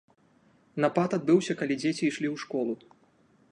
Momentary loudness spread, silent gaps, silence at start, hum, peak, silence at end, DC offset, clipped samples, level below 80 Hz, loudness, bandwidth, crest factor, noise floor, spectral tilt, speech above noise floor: 9 LU; none; 0.75 s; none; -10 dBFS; 0.75 s; under 0.1%; under 0.1%; -76 dBFS; -28 LUFS; 10.5 kHz; 20 dB; -63 dBFS; -6 dB/octave; 36 dB